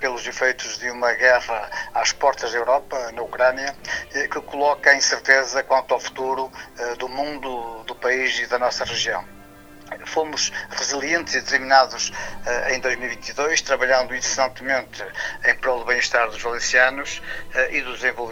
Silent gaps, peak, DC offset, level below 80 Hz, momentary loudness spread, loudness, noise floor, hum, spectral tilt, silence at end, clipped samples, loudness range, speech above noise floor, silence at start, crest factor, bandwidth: none; 0 dBFS; under 0.1%; -48 dBFS; 12 LU; -21 LUFS; -44 dBFS; none; -1 dB/octave; 0 s; under 0.1%; 4 LU; 22 dB; 0 s; 22 dB; 17 kHz